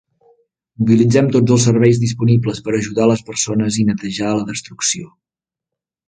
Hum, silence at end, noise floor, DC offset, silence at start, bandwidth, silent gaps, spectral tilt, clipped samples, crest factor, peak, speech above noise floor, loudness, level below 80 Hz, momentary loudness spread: none; 1 s; -85 dBFS; under 0.1%; 0.8 s; 9.6 kHz; none; -5.5 dB/octave; under 0.1%; 16 dB; 0 dBFS; 70 dB; -16 LUFS; -50 dBFS; 8 LU